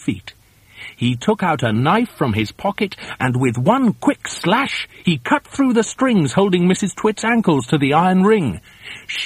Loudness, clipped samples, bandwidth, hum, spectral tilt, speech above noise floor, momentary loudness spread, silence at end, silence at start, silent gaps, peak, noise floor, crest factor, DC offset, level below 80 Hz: -17 LUFS; under 0.1%; 15 kHz; none; -5.5 dB/octave; 23 dB; 9 LU; 0 s; 0 s; none; 0 dBFS; -41 dBFS; 16 dB; under 0.1%; -50 dBFS